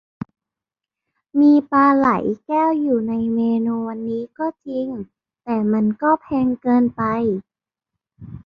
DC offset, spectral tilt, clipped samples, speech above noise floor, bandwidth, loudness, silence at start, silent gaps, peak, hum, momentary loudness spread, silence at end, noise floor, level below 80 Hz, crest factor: under 0.1%; -9.5 dB/octave; under 0.1%; 69 dB; 5.2 kHz; -19 LUFS; 1.35 s; none; -4 dBFS; none; 16 LU; 0.1 s; -87 dBFS; -56 dBFS; 16 dB